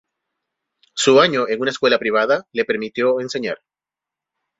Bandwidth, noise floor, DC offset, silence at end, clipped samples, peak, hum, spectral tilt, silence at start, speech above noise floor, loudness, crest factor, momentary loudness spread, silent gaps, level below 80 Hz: 8 kHz; -88 dBFS; under 0.1%; 1.05 s; under 0.1%; 0 dBFS; none; -3.5 dB/octave; 0.95 s; 71 dB; -18 LUFS; 20 dB; 12 LU; none; -64 dBFS